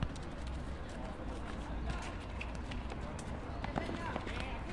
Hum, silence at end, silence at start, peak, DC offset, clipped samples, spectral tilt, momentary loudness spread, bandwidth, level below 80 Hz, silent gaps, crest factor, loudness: none; 0 s; 0 s; -16 dBFS; under 0.1%; under 0.1%; -6 dB/octave; 4 LU; 11.5 kHz; -44 dBFS; none; 24 dB; -43 LUFS